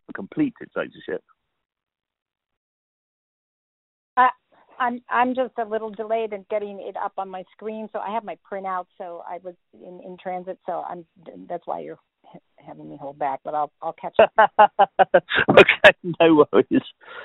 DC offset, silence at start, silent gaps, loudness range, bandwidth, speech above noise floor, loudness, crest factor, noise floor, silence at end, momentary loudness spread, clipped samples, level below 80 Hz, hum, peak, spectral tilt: under 0.1%; 0.1 s; 2.22-2.26 s, 2.57-4.16 s; 18 LU; 4.2 kHz; 28 dB; -20 LUFS; 22 dB; -50 dBFS; 0 s; 21 LU; under 0.1%; -60 dBFS; none; 0 dBFS; -2.5 dB/octave